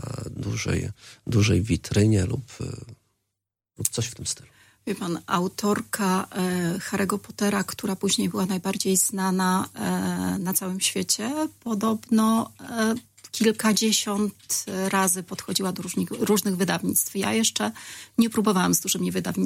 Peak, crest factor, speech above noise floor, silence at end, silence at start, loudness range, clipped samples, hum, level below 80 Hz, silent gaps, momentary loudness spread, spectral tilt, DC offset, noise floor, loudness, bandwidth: 0 dBFS; 26 dB; 59 dB; 0 s; 0 s; 4 LU; under 0.1%; none; -52 dBFS; none; 10 LU; -4 dB/octave; under 0.1%; -84 dBFS; -24 LUFS; 16.5 kHz